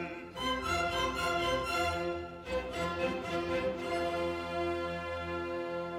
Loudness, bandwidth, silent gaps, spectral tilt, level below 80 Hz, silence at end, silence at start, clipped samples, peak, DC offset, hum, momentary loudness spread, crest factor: -34 LUFS; 16 kHz; none; -4.5 dB/octave; -52 dBFS; 0 s; 0 s; under 0.1%; -20 dBFS; under 0.1%; none; 6 LU; 16 dB